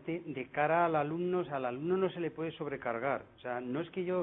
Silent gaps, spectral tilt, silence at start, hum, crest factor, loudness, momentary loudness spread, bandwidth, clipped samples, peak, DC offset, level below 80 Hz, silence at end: none; -5.5 dB/octave; 0 s; none; 18 dB; -35 LUFS; 10 LU; 4 kHz; under 0.1%; -16 dBFS; under 0.1%; -72 dBFS; 0 s